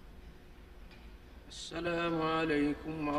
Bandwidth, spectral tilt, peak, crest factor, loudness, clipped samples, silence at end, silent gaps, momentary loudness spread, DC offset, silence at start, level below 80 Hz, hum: 12.5 kHz; -5.5 dB/octave; -20 dBFS; 16 dB; -34 LUFS; under 0.1%; 0 s; none; 24 LU; under 0.1%; 0 s; -54 dBFS; none